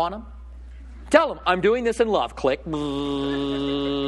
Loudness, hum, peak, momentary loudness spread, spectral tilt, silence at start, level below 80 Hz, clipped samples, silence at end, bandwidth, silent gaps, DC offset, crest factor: -23 LUFS; none; 0 dBFS; 23 LU; -5.5 dB/octave; 0 s; -42 dBFS; under 0.1%; 0 s; 12 kHz; none; under 0.1%; 24 dB